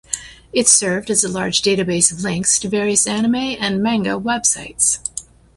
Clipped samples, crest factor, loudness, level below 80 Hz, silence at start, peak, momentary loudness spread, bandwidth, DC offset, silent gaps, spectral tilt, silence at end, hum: under 0.1%; 18 dB; -16 LUFS; -50 dBFS; 0.1 s; 0 dBFS; 9 LU; 12 kHz; under 0.1%; none; -2.5 dB/octave; 0.35 s; none